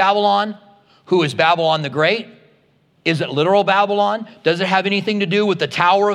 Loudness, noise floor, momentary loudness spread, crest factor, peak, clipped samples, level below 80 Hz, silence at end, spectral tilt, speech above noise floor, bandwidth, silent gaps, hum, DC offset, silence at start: -17 LUFS; -57 dBFS; 6 LU; 16 dB; 0 dBFS; under 0.1%; -70 dBFS; 0 s; -5.5 dB/octave; 41 dB; 11.5 kHz; none; none; under 0.1%; 0 s